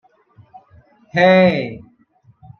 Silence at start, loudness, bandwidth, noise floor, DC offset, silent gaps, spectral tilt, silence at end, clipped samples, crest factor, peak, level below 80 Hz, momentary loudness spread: 1.15 s; -14 LUFS; 6.6 kHz; -54 dBFS; under 0.1%; none; -7.5 dB/octave; 0.8 s; under 0.1%; 18 dB; -2 dBFS; -58 dBFS; 19 LU